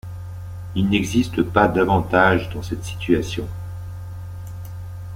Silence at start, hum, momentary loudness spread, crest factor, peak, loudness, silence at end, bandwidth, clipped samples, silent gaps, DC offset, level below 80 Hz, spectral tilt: 0.05 s; none; 18 LU; 20 dB; -2 dBFS; -20 LUFS; 0 s; 16 kHz; under 0.1%; none; under 0.1%; -40 dBFS; -6 dB/octave